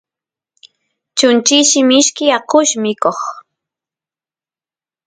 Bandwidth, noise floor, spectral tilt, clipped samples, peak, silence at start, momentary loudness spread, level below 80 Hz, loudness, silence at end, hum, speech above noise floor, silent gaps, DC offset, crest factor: 10 kHz; under -90 dBFS; -1.5 dB/octave; under 0.1%; 0 dBFS; 1.15 s; 10 LU; -64 dBFS; -12 LUFS; 1.65 s; none; over 78 dB; none; under 0.1%; 16 dB